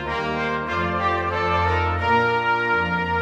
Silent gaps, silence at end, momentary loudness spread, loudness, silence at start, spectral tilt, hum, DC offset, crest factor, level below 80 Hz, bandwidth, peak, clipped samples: none; 0 s; 5 LU; -21 LUFS; 0 s; -6.5 dB/octave; none; under 0.1%; 14 dB; -40 dBFS; 8.4 kHz; -8 dBFS; under 0.1%